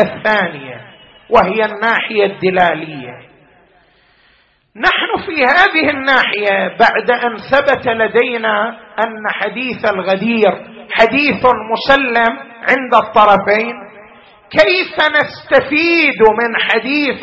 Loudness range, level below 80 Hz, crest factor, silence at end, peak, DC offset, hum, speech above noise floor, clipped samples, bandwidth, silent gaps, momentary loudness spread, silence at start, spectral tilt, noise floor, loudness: 4 LU; -46 dBFS; 14 dB; 0 s; 0 dBFS; under 0.1%; none; 40 dB; under 0.1%; 7.8 kHz; none; 10 LU; 0 s; -5.5 dB/octave; -53 dBFS; -13 LUFS